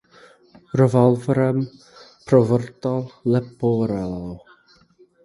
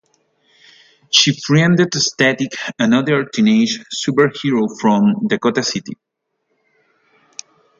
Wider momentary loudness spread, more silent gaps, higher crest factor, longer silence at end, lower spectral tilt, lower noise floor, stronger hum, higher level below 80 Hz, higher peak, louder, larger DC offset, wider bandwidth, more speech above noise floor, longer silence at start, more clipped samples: about the same, 14 LU vs 12 LU; neither; about the same, 20 dB vs 18 dB; second, 0.85 s vs 1.85 s; first, -9 dB/octave vs -4.5 dB/octave; second, -55 dBFS vs -70 dBFS; neither; first, -52 dBFS vs -60 dBFS; about the same, -2 dBFS vs 0 dBFS; second, -20 LUFS vs -15 LUFS; neither; first, 11.5 kHz vs 7.8 kHz; second, 36 dB vs 55 dB; second, 0.75 s vs 1.1 s; neither